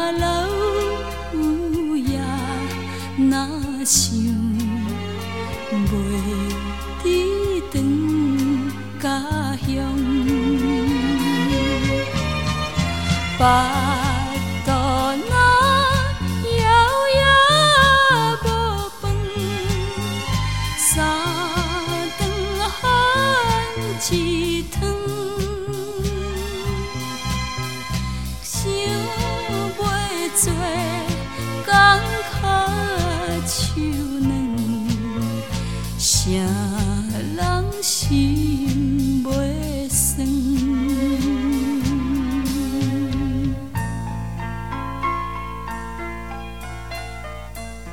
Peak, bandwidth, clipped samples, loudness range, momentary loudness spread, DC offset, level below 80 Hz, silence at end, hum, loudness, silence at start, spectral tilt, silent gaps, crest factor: -2 dBFS; 17.5 kHz; under 0.1%; 9 LU; 11 LU; 1%; -32 dBFS; 0 s; none; -20 LUFS; 0 s; -4 dB/octave; none; 18 dB